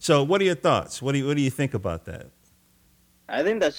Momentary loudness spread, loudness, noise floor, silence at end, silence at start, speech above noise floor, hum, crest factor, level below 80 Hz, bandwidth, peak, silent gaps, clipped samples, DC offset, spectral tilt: 13 LU; -24 LUFS; -61 dBFS; 0 s; 0 s; 37 dB; none; 18 dB; -54 dBFS; 18.5 kHz; -6 dBFS; none; under 0.1%; under 0.1%; -5.5 dB/octave